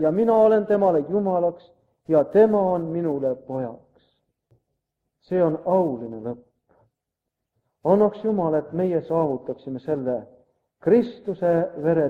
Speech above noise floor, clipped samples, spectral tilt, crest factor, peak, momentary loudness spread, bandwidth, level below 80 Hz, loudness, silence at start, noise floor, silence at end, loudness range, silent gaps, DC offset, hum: 62 dB; under 0.1%; -10 dB/octave; 18 dB; -6 dBFS; 13 LU; 4.9 kHz; -64 dBFS; -22 LUFS; 0 s; -83 dBFS; 0 s; 6 LU; none; under 0.1%; none